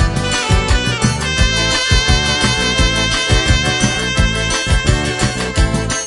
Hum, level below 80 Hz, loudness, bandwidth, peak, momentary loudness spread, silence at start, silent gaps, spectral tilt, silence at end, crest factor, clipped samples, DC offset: none; -20 dBFS; -14 LUFS; 11 kHz; 0 dBFS; 4 LU; 0 s; none; -3.5 dB/octave; 0 s; 14 dB; under 0.1%; under 0.1%